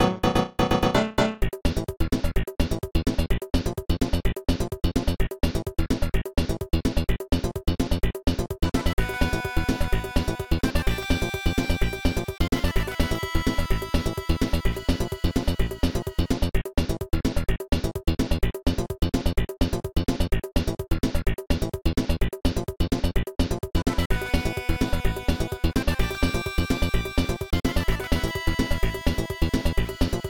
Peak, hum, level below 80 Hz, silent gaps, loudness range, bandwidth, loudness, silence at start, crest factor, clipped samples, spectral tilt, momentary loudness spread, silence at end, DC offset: -8 dBFS; none; -28 dBFS; 8.93-8.97 s, 24.06-24.10 s; 1 LU; 19.5 kHz; -27 LUFS; 0 s; 16 dB; under 0.1%; -6 dB/octave; 3 LU; 0 s; under 0.1%